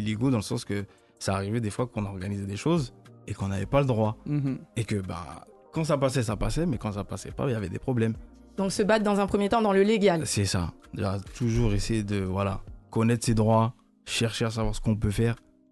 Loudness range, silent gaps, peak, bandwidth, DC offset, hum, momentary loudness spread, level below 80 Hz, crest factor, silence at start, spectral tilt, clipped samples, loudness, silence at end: 5 LU; none; -10 dBFS; 12.5 kHz; under 0.1%; none; 12 LU; -42 dBFS; 18 dB; 0 s; -6 dB/octave; under 0.1%; -27 LUFS; 0.35 s